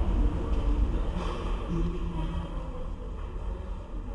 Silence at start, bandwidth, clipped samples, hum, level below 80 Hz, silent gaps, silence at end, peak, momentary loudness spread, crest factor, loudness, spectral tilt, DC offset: 0 s; 7.2 kHz; under 0.1%; none; -30 dBFS; none; 0 s; -16 dBFS; 10 LU; 14 dB; -34 LUFS; -8 dB/octave; under 0.1%